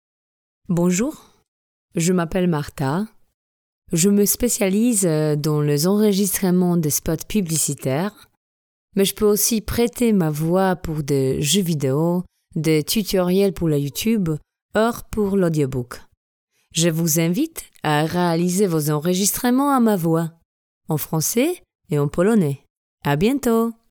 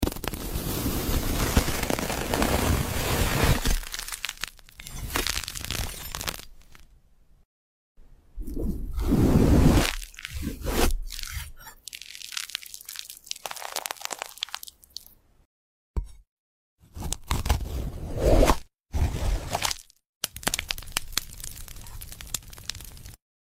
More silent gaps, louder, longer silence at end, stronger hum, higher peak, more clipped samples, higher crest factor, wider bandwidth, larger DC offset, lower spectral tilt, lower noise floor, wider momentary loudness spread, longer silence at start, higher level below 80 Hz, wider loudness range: first, 1.48-1.89 s, 3.34-3.82 s, 8.37-8.88 s, 14.62-14.69 s, 16.17-16.48 s, 20.45-20.81 s, 21.75-21.79 s, 22.70-22.98 s vs 7.45-7.95 s, 15.45-15.94 s, 16.29-16.78 s, 20.09-20.21 s; first, -20 LUFS vs -28 LUFS; second, 0.2 s vs 0.35 s; neither; about the same, -4 dBFS vs -6 dBFS; neither; second, 16 dB vs 22 dB; first, over 20 kHz vs 16.5 kHz; neither; about the same, -5 dB/octave vs -4.5 dB/octave; first, under -90 dBFS vs -57 dBFS; second, 8 LU vs 17 LU; first, 0.7 s vs 0 s; second, -46 dBFS vs -32 dBFS; second, 3 LU vs 11 LU